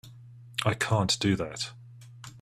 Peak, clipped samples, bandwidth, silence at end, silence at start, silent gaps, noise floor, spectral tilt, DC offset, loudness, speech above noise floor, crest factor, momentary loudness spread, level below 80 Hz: -10 dBFS; under 0.1%; 14.5 kHz; 0 s; 0.05 s; none; -49 dBFS; -4.5 dB/octave; under 0.1%; -28 LUFS; 21 dB; 20 dB; 22 LU; -56 dBFS